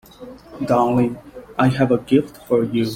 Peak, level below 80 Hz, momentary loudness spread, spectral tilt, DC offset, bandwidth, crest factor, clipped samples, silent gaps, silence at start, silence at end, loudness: -2 dBFS; -50 dBFS; 20 LU; -7.5 dB/octave; under 0.1%; 16 kHz; 16 dB; under 0.1%; none; 0.2 s; 0 s; -19 LUFS